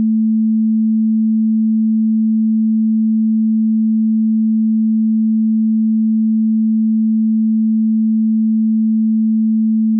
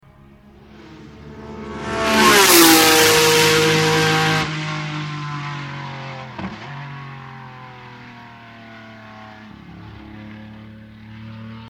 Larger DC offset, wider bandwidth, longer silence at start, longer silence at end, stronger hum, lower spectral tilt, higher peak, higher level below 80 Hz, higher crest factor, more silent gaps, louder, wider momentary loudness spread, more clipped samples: neither; second, 0.3 kHz vs 19 kHz; second, 0 s vs 0.85 s; about the same, 0 s vs 0 s; neither; first, -20 dB/octave vs -2.5 dB/octave; second, -10 dBFS vs 0 dBFS; second, under -90 dBFS vs -48 dBFS; second, 4 dB vs 20 dB; neither; about the same, -15 LUFS vs -14 LUFS; second, 0 LU vs 28 LU; neither